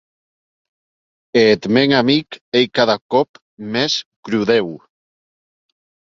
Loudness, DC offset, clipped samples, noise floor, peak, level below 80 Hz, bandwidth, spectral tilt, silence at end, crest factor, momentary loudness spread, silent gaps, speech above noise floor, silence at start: -16 LUFS; under 0.1%; under 0.1%; under -90 dBFS; 0 dBFS; -58 dBFS; 7.6 kHz; -5 dB/octave; 1.25 s; 18 dB; 10 LU; 2.41-2.52 s, 3.01-3.09 s, 3.29-3.34 s, 3.42-3.57 s, 4.06-4.23 s; over 74 dB; 1.35 s